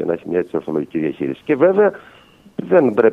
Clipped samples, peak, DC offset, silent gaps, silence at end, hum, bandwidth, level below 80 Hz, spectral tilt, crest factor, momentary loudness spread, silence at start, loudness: under 0.1%; 0 dBFS; under 0.1%; none; 0 s; none; 4.3 kHz; -58 dBFS; -9 dB/octave; 18 dB; 11 LU; 0 s; -18 LUFS